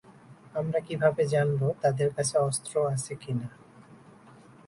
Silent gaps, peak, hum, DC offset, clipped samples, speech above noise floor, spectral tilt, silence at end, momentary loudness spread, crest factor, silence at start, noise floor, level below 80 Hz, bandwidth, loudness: none; -10 dBFS; none; under 0.1%; under 0.1%; 26 dB; -5.5 dB/octave; 0.7 s; 9 LU; 18 dB; 0.1 s; -53 dBFS; -62 dBFS; 11.5 kHz; -28 LUFS